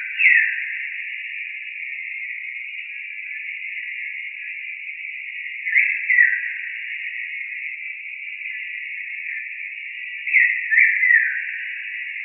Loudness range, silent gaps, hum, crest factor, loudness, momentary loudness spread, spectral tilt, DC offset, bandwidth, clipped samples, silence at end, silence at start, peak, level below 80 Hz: 10 LU; none; none; 22 dB; -21 LUFS; 15 LU; 19 dB/octave; under 0.1%; 3.2 kHz; under 0.1%; 0 s; 0 s; -2 dBFS; under -90 dBFS